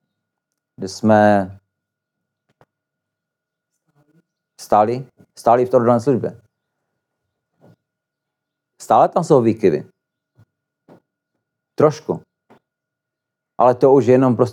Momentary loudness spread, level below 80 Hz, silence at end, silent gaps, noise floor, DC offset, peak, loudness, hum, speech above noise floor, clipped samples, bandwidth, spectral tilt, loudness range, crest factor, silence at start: 16 LU; -66 dBFS; 0 s; none; -82 dBFS; under 0.1%; -2 dBFS; -16 LUFS; none; 67 dB; under 0.1%; 13.5 kHz; -7.5 dB/octave; 6 LU; 18 dB; 0.8 s